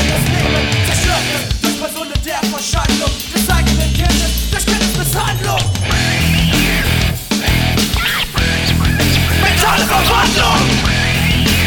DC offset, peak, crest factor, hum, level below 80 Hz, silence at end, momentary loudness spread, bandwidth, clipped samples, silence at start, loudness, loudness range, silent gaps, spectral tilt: under 0.1%; 0 dBFS; 14 dB; none; -22 dBFS; 0 s; 5 LU; 19.5 kHz; under 0.1%; 0 s; -14 LUFS; 3 LU; none; -4 dB/octave